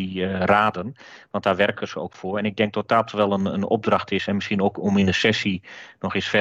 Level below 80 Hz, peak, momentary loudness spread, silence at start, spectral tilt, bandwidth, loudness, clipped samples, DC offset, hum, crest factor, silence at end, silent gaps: -58 dBFS; -6 dBFS; 12 LU; 0 s; -6 dB/octave; 7.8 kHz; -22 LUFS; under 0.1%; under 0.1%; none; 16 dB; 0 s; none